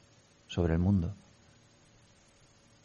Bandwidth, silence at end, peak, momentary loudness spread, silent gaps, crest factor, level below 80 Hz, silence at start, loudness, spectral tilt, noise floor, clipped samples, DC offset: 7.6 kHz; 1.7 s; -16 dBFS; 13 LU; none; 18 dB; -48 dBFS; 0.5 s; -31 LUFS; -8 dB/octave; -62 dBFS; under 0.1%; under 0.1%